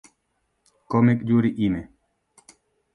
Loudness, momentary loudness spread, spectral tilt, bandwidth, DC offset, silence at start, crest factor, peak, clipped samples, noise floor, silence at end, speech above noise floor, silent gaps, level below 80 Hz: -22 LUFS; 7 LU; -8.5 dB/octave; 10.5 kHz; under 0.1%; 0.9 s; 18 dB; -6 dBFS; under 0.1%; -73 dBFS; 1.1 s; 53 dB; none; -54 dBFS